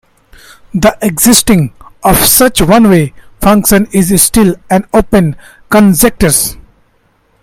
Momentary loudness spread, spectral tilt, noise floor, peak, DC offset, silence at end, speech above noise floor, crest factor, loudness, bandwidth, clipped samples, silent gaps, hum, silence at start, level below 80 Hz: 9 LU; -4 dB/octave; -53 dBFS; 0 dBFS; under 0.1%; 0.9 s; 45 dB; 10 dB; -8 LUFS; over 20 kHz; 0.6%; none; none; 0.75 s; -26 dBFS